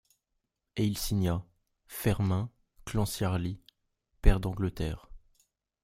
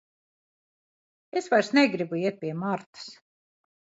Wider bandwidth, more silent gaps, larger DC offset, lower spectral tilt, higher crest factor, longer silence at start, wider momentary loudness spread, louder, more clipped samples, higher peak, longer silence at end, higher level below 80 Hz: first, 16 kHz vs 8 kHz; second, none vs 2.86-2.93 s; neither; about the same, -6 dB/octave vs -5.5 dB/octave; about the same, 26 dB vs 22 dB; second, 0.75 s vs 1.35 s; second, 13 LU vs 20 LU; second, -32 LUFS vs -26 LUFS; neither; about the same, -6 dBFS vs -6 dBFS; second, 0.65 s vs 0.85 s; first, -36 dBFS vs -78 dBFS